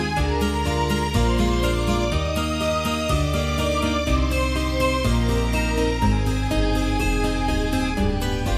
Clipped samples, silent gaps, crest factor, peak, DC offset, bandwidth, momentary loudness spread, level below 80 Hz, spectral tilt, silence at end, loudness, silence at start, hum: under 0.1%; none; 12 dB; -8 dBFS; under 0.1%; 15.5 kHz; 2 LU; -26 dBFS; -5.5 dB/octave; 0 s; -22 LUFS; 0 s; none